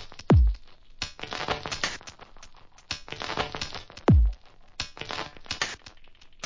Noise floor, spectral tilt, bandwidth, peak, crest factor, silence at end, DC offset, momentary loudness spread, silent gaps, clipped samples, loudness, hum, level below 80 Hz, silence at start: -49 dBFS; -5.5 dB/octave; 7.6 kHz; -10 dBFS; 18 dB; 0 s; 0.1%; 18 LU; none; under 0.1%; -28 LUFS; none; -32 dBFS; 0 s